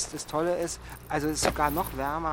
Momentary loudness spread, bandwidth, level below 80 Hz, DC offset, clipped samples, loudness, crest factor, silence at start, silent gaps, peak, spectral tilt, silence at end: 8 LU; 17 kHz; -44 dBFS; under 0.1%; under 0.1%; -29 LUFS; 20 dB; 0 s; none; -10 dBFS; -4 dB/octave; 0 s